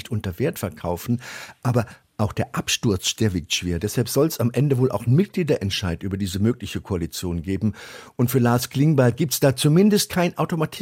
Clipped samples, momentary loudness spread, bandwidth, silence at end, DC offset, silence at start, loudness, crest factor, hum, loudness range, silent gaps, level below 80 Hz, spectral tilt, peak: under 0.1%; 10 LU; 17 kHz; 0 s; under 0.1%; 0.05 s; -22 LUFS; 16 dB; none; 4 LU; none; -50 dBFS; -5.5 dB/octave; -6 dBFS